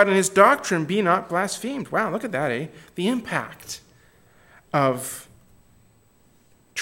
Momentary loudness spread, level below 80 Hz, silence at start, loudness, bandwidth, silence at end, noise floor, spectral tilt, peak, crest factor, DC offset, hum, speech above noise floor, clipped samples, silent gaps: 18 LU; -64 dBFS; 0 s; -22 LUFS; 17 kHz; 0 s; -58 dBFS; -4.5 dB/octave; 0 dBFS; 24 dB; under 0.1%; none; 36 dB; under 0.1%; none